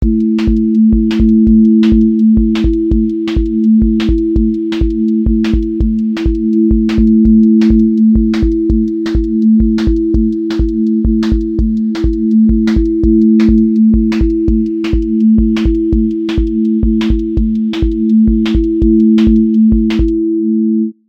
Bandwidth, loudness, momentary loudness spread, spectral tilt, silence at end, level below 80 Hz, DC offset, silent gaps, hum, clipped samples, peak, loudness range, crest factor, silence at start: 6.4 kHz; -11 LUFS; 6 LU; -9 dB/octave; 0.15 s; -18 dBFS; under 0.1%; none; none; under 0.1%; 0 dBFS; 3 LU; 10 dB; 0 s